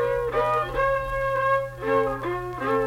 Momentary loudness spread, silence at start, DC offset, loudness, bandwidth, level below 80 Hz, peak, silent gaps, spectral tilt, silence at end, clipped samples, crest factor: 5 LU; 0 s; under 0.1%; -25 LUFS; 16 kHz; -42 dBFS; -10 dBFS; none; -6.5 dB/octave; 0 s; under 0.1%; 14 dB